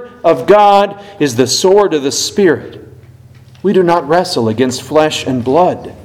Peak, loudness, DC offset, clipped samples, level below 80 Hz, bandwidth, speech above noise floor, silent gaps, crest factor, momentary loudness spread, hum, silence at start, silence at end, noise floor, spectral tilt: 0 dBFS; -12 LUFS; under 0.1%; 0.4%; -50 dBFS; 16 kHz; 27 dB; none; 12 dB; 8 LU; none; 0 s; 0 s; -39 dBFS; -4.5 dB/octave